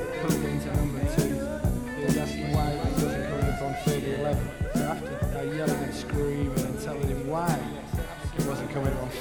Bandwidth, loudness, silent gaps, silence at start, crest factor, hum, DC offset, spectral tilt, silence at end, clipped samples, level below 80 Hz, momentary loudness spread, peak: over 20 kHz; -29 LUFS; none; 0 s; 18 dB; none; 0.1%; -6 dB/octave; 0 s; under 0.1%; -36 dBFS; 4 LU; -10 dBFS